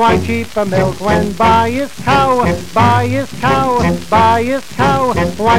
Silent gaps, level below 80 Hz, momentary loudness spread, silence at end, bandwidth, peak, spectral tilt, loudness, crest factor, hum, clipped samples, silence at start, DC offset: none; -32 dBFS; 6 LU; 0 s; 16 kHz; 0 dBFS; -6 dB/octave; -13 LUFS; 12 dB; none; under 0.1%; 0 s; 3%